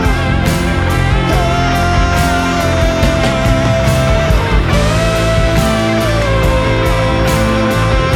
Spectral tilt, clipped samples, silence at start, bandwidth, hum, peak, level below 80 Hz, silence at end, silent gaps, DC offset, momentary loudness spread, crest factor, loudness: -5.5 dB/octave; under 0.1%; 0 s; 17.5 kHz; none; 0 dBFS; -18 dBFS; 0 s; none; under 0.1%; 1 LU; 12 dB; -13 LUFS